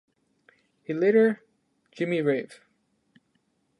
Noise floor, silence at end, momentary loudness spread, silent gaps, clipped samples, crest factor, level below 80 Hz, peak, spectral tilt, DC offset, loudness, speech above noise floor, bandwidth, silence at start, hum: -72 dBFS; 1.25 s; 20 LU; none; under 0.1%; 18 dB; -84 dBFS; -10 dBFS; -7.5 dB/octave; under 0.1%; -25 LUFS; 48 dB; 10.5 kHz; 0.9 s; none